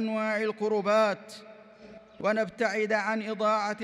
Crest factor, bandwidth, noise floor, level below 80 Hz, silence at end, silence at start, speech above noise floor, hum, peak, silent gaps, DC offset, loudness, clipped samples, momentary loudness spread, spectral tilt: 14 dB; 12 kHz; -50 dBFS; -74 dBFS; 0 s; 0 s; 22 dB; none; -14 dBFS; none; under 0.1%; -28 LUFS; under 0.1%; 8 LU; -5 dB/octave